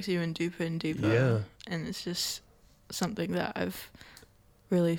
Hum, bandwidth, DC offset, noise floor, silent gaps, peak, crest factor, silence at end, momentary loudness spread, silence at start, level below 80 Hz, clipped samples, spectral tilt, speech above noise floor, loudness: none; 18 kHz; under 0.1%; -60 dBFS; none; -12 dBFS; 20 dB; 0 s; 14 LU; 0 s; -62 dBFS; under 0.1%; -5.5 dB/octave; 29 dB; -32 LUFS